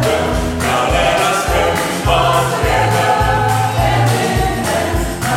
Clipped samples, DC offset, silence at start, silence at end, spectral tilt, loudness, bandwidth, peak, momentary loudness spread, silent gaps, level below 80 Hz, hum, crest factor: under 0.1%; under 0.1%; 0 s; 0 s; -4.5 dB/octave; -14 LUFS; 16.5 kHz; -2 dBFS; 4 LU; none; -26 dBFS; none; 12 dB